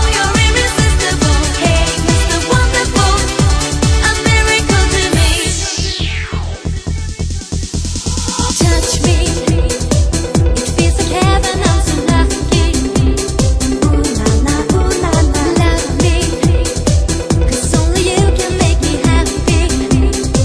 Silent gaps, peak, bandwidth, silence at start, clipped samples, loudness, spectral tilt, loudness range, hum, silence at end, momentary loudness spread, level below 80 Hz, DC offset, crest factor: none; 0 dBFS; 11 kHz; 0 s; under 0.1%; -13 LUFS; -4.5 dB/octave; 4 LU; none; 0 s; 6 LU; -16 dBFS; under 0.1%; 12 dB